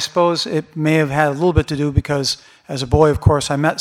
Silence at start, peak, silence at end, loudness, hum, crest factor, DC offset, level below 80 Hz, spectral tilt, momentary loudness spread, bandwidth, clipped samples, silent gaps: 0 s; 0 dBFS; 0 s; -17 LUFS; none; 16 dB; under 0.1%; -32 dBFS; -5.5 dB/octave; 8 LU; 15 kHz; under 0.1%; none